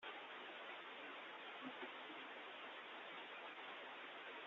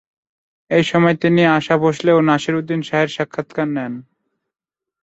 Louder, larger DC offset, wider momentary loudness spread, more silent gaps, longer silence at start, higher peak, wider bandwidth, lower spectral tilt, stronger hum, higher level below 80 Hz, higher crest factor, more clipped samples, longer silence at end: second, -53 LUFS vs -17 LUFS; neither; second, 1 LU vs 10 LU; neither; second, 0 s vs 0.7 s; second, -40 dBFS vs -2 dBFS; second, 7.2 kHz vs 8 kHz; second, 1 dB/octave vs -6.5 dB/octave; neither; second, under -90 dBFS vs -58 dBFS; about the same, 14 dB vs 16 dB; neither; second, 0 s vs 1 s